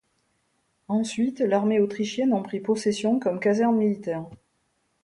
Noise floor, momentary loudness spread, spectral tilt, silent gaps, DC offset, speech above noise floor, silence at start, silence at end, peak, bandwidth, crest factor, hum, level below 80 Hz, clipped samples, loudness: -72 dBFS; 8 LU; -6 dB/octave; none; under 0.1%; 48 dB; 0.9 s; 0.7 s; -10 dBFS; 11 kHz; 16 dB; none; -68 dBFS; under 0.1%; -25 LUFS